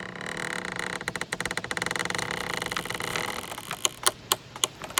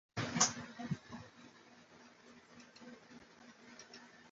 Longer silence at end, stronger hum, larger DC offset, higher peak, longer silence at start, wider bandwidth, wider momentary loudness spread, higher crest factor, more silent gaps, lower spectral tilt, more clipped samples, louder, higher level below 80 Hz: about the same, 0 s vs 0 s; neither; neither; first, -2 dBFS vs -14 dBFS; second, 0 s vs 0.15 s; first, 18 kHz vs 7.6 kHz; second, 7 LU vs 27 LU; about the same, 30 dB vs 30 dB; neither; second, -1.5 dB/octave vs -3 dB/octave; neither; first, -29 LUFS vs -37 LUFS; first, -56 dBFS vs -74 dBFS